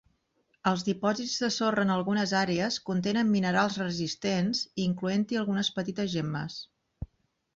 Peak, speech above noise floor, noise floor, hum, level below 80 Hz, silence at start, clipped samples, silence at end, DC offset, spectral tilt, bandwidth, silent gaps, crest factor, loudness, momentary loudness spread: -12 dBFS; 44 dB; -73 dBFS; none; -58 dBFS; 0.65 s; under 0.1%; 0.5 s; under 0.1%; -5 dB/octave; 7.8 kHz; none; 18 dB; -29 LUFS; 8 LU